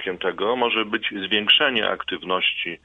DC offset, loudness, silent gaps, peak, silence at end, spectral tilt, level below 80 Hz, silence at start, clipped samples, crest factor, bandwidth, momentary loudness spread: under 0.1%; -20 LUFS; none; -4 dBFS; 0.1 s; -5 dB/octave; -60 dBFS; 0 s; under 0.1%; 18 dB; 7 kHz; 9 LU